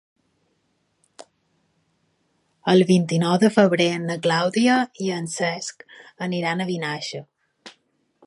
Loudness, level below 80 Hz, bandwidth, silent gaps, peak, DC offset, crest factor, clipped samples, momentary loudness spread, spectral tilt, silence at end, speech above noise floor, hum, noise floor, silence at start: -21 LUFS; -70 dBFS; 11.5 kHz; none; -2 dBFS; under 0.1%; 20 dB; under 0.1%; 14 LU; -5.5 dB/octave; 0.55 s; 49 dB; none; -69 dBFS; 2.65 s